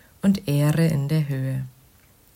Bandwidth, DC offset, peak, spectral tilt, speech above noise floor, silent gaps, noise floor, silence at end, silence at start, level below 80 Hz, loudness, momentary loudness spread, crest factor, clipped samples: 16 kHz; under 0.1%; -10 dBFS; -7.5 dB/octave; 34 dB; none; -55 dBFS; 0.65 s; 0.25 s; -54 dBFS; -23 LUFS; 10 LU; 14 dB; under 0.1%